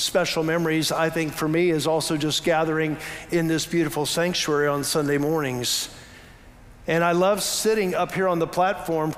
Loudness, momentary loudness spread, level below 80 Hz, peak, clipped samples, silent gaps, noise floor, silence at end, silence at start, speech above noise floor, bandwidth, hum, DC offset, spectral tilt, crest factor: -23 LUFS; 4 LU; -52 dBFS; -8 dBFS; under 0.1%; none; -47 dBFS; 0 s; 0 s; 24 dB; 16 kHz; none; under 0.1%; -4 dB/octave; 14 dB